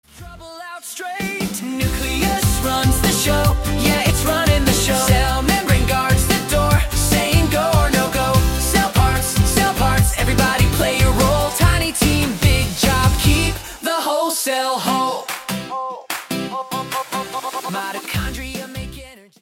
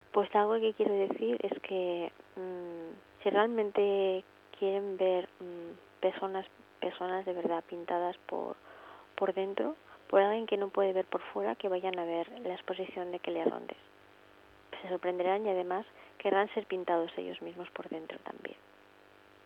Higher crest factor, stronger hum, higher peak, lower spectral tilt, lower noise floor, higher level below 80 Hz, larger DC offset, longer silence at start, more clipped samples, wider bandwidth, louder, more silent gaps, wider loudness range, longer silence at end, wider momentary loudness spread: about the same, 16 dB vs 20 dB; neither; first, -2 dBFS vs -14 dBFS; second, -4 dB/octave vs -7 dB/octave; second, -38 dBFS vs -60 dBFS; first, -26 dBFS vs -80 dBFS; neither; about the same, 0.15 s vs 0.15 s; neither; first, 17 kHz vs 5.2 kHz; first, -17 LUFS vs -34 LUFS; neither; first, 7 LU vs 4 LU; second, 0.25 s vs 0.9 s; second, 10 LU vs 16 LU